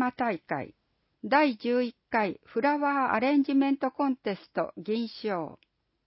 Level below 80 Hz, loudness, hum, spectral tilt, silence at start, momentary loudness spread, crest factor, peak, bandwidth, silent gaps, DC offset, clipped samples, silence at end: -72 dBFS; -28 LUFS; none; -9.5 dB/octave; 0 s; 10 LU; 18 dB; -10 dBFS; 5.8 kHz; none; under 0.1%; under 0.1%; 0.5 s